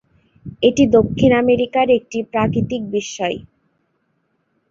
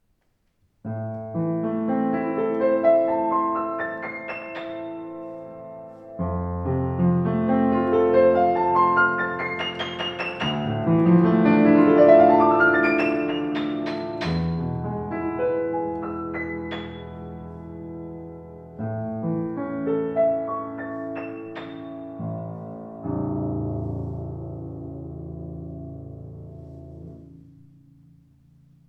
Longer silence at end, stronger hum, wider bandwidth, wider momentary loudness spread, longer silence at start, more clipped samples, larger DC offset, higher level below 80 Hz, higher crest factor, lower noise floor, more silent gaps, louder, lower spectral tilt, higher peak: second, 1.3 s vs 1.5 s; neither; first, 7.6 kHz vs 6.2 kHz; second, 10 LU vs 20 LU; second, 0.45 s vs 0.85 s; neither; neither; first, -44 dBFS vs -50 dBFS; about the same, 18 dB vs 20 dB; about the same, -67 dBFS vs -68 dBFS; neither; first, -17 LUFS vs -22 LUFS; second, -6 dB/octave vs -8.5 dB/octave; first, 0 dBFS vs -4 dBFS